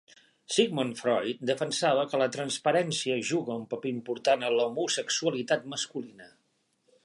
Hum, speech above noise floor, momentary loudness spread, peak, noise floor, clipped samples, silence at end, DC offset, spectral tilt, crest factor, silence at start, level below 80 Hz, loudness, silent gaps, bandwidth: none; 45 dB; 8 LU; -10 dBFS; -73 dBFS; under 0.1%; 0.75 s; under 0.1%; -3.5 dB/octave; 20 dB; 0.5 s; -80 dBFS; -29 LUFS; none; 11.5 kHz